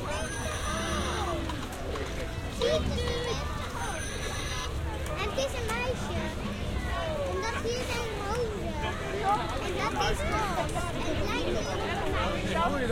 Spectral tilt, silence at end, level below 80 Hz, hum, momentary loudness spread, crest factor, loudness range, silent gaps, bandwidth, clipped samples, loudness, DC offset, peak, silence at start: -4.5 dB/octave; 0 s; -38 dBFS; none; 6 LU; 16 dB; 2 LU; none; 16.5 kHz; under 0.1%; -31 LUFS; under 0.1%; -14 dBFS; 0 s